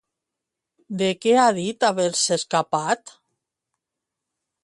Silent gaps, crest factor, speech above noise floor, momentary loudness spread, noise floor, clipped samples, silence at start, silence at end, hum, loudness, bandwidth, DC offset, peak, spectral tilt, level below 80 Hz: none; 20 dB; 64 dB; 8 LU; -85 dBFS; under 0.1%; 0.9 s; 1.55 s; none; -21 LUFS; 11.5 kHz; under 0.1%; -4 dBFS; -3.5 dB/octave; -70 dBFS